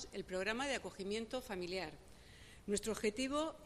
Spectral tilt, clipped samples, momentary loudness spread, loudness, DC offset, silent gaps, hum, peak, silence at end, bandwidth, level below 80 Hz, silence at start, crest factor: -3.5 dB/octave; under 0.1%; 19 LU; -41 LUFS; under 0.1%; none; none; -22 dBFS; 0 s; 15 kHz; -62 dBFS; 0 s; 20 dB